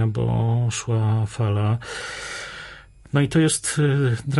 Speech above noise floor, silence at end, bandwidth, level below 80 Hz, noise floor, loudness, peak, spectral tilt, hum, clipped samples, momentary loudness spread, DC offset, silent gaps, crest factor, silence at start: 22 dB; 0 s; 11.5 kHz; -46 dBFS; -43 dBFS; -22 LUFS; -8 dBFS; -5.5 dB/octave; none; under 0.1%; 12 LU; under 0.1%; none; 14 dB; 0 s